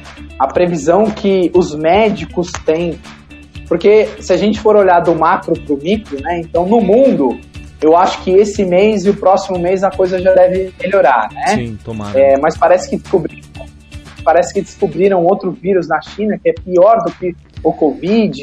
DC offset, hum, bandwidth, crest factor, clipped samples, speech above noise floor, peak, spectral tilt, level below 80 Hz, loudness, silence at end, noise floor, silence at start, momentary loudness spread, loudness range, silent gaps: under 0.1%; none; 10 kHz; 12 dB; under 0.1%; 22 dB; 0 dBFS; -6 dB/octave; -38 dBFS; -13 LUFS; 0 s; -34 dBFS; 0.05 s; 9 LU; 3 LU; none